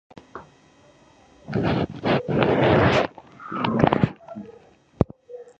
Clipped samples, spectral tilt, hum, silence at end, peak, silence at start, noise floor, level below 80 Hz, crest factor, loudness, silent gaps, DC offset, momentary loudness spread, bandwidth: under 0.1%; -7.5 dB/octave; none; 0.15 s; 0 dBFS; 0.35 s; -54 dBFS; -44 dBFS; 24 dB; -22 LUFS; none; under 0.1%; 24 LU; 8 kHz